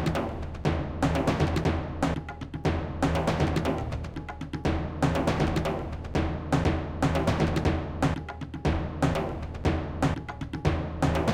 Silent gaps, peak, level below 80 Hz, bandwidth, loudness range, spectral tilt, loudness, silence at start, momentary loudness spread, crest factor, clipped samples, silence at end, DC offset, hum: none; -12 dBFS; -36 dBFS; 15.5 kHz; 2 LU; -7 dB/octave; -29 LUFS; 0 s; 8 LU; 16 dB; under 0.1%; 0 s; under 0.1%; none